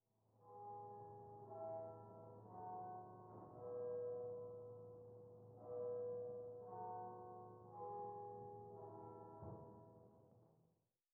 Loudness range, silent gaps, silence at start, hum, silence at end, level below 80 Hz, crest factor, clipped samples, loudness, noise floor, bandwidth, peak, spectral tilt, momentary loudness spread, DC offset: 5 LU; none; 0.35 s; none; 0.5 s; -86 dBFS; 14 dB; under 0.1%; -53 LUFS; -84 dBFS; 2.1 kHz; -40 dBFS; -6.5 dB/octave; 12 LU; under 0.1%